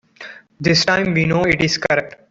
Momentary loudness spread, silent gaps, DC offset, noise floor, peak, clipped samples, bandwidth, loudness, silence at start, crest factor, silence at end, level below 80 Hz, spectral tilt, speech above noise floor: 22 LU; none; under 0.1%; -39 dBFS; -2 dBFS; under 0.1%; 7.8 kHz; -16 LUFS; 0.2 s; 16 dB; 0.2 s; -46 dBFS; -4.5 dB/octave; 22 dB